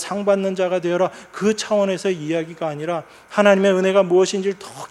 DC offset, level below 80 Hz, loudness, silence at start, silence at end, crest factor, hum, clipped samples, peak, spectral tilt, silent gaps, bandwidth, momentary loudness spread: under 0.1%; -66 dBFS; -19 LUFS; 0 s; 0.05 s; 20 dB; none; under 0.1%; 0 dBFS; -5 dB/octave; none; 12.5 kHz; 10 LU